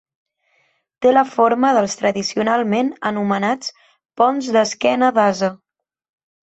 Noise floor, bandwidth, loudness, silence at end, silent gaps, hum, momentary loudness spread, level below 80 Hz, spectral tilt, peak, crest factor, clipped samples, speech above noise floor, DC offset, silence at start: -63 dBFS; 8.2 kHz; -17 LUFS; 0.9 s; none; none; 7 LU; -64 dBFS; -4.5 dB/octave; -2 dBFS; 16 dB; under 0.1%; 47 dB; under 0.1%; 1 s